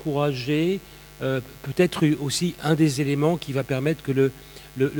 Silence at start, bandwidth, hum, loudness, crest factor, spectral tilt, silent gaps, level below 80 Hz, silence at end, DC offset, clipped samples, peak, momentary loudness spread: 0 s; 18 kHz; none; -24 LUFS; 18 dB; -6 dB/octave; none; -52 dBFS; 0 s; under 0.1%; under 0.1%; -6 dBFS; 9 LU